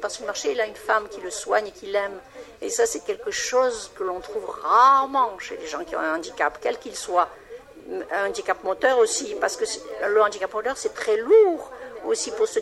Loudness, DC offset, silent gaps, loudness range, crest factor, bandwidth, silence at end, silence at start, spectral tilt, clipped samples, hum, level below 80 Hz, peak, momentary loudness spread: -23 LUFS; under 0.1%; none; 5 LU; 18 dB; 13 kHz; 0 s; 0 s; -1 dB/octave; under 0.1%; none; -60 dBFS; -6 dBFS; 15 LU